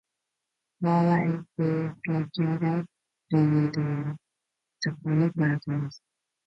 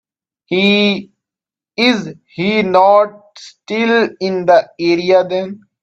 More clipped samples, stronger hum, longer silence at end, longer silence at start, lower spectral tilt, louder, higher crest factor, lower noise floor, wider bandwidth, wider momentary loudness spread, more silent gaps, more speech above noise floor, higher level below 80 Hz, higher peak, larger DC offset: neither; neither; first, 0.5 s vs 0.25 s; first, 0.8 s vs 0.5 s; first, -8 dB/octave vs -5.5 dB/octave; second, -27 LUFS vs -14 LUFS; about the same, 16 dB vs 14 dB; second, -84 dBFS vs -88 dBFS; second, 6.6 kHz vs 8 kHz; about the same, 10 LU vs 11 LU; neither; second, 58 dB vs 75 dB; second, -66 dBFS vs -60 dBFS; second, -12 dBFS vs 0 dBFS; neither